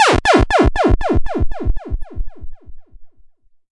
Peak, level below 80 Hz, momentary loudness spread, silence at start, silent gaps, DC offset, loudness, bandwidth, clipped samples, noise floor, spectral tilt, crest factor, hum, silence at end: 0 dBFS; -22 dBFS; 20 LU; 0 s; none; under 0.1%; -16 LUFS; 11.5 kHz; under 0.1%; -46 dBFS; -5.5 dB/octave; 14 dB; none; 0.5 s